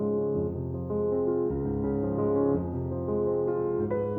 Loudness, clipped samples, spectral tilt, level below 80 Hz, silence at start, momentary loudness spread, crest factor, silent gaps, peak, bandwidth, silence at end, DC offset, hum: -29 LUFS; under 0.1%; -13.5 dB/octave; -48 dBFS; 0 s; 6 LU; 14 dB; none; -14 dBFS; 2.6 kHz; 0 s; under 0.1%; none